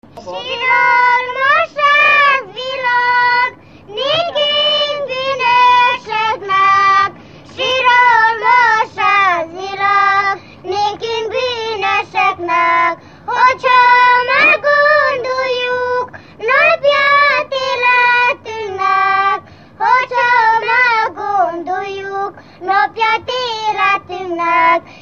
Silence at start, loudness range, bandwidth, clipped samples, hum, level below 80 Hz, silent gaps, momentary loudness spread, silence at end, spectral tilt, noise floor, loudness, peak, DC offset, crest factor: 0.15 s; 4 LU; 7.2 kHz; under 0.1%; none; -58 dBFS; none; 12 LU; 0.1 s; -2.5 dB/octave; -35 dBFS; -12 LUFS; 0 dBFS; 0.2%; 14 dB